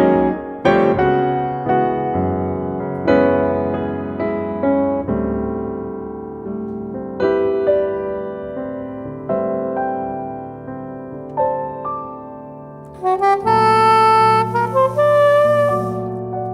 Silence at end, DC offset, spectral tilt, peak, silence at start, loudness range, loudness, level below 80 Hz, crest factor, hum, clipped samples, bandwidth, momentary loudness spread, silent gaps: 0 s; under 0.1%; -7.5 dB/octave; -2 dBFS; 0 s; 10 LU; -18 LUFS; -44 dBFS; 16 dB; none; under 0.1%; 13 kHz; 16 LU; none